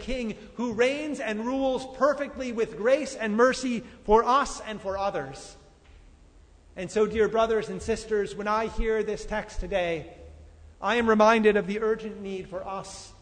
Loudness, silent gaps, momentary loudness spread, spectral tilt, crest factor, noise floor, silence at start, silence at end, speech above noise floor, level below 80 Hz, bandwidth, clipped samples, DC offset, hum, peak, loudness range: -26 LUFS; none; 14 LU; -4.5 dB/octave; 20 dB; -54 dBFS; 0 s; 0.1 s; 28 dB; -44 dBFS; 9.6 kHz; under 0.1%; under 0.1%; none; -8 dBFS; 4 LU